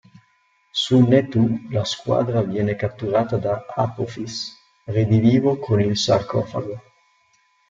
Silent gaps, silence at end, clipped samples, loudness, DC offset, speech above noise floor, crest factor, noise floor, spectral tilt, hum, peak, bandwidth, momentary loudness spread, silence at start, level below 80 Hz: none; 0.9 s; under 0.1%; -21 LUFS; under 0.1%; 43 dB; 18 dB; -62 dBFS; -6.5 dB/octave; none; -2 dBFS; 7.8 kHz; 12 LU; 0.75 s; -54 dBFS